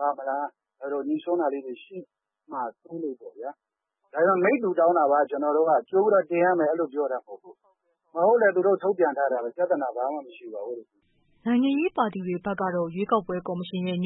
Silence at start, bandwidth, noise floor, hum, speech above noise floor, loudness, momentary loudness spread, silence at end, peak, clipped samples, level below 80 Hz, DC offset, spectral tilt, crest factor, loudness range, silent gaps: 0 s; 4.1 kHz; -69 dBFS; none; 44 dB; -25 LUFS; 16 LU; 0 s; -10 dBFS; under 0.1%; -72 dBFS; under 0.1%; -11 dB/octave; 16 dB; 9 LU; none